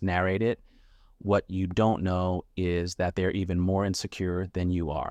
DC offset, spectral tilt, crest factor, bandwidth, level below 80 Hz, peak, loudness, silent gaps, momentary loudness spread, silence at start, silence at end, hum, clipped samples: under 0.1%; -6.5 dB/octave; 16 dB; 12.5 kHz; -46 dBFS; -12 dBFS; -28 LUFS; none; 5 LU; 0 s; 0 s; none; under 0.1%